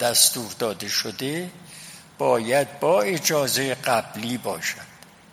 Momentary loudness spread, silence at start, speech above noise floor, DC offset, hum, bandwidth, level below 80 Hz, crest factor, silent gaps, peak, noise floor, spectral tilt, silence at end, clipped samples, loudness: 18 LU; 0 s; 20 dB; under 0.1%; none; 17 kHz; -66 dBFS; 22 dB; none; -2 dBFS; -43 dBFS; -2.5 dB/octave; 0.4 s; under 0.1%; -23 LUFS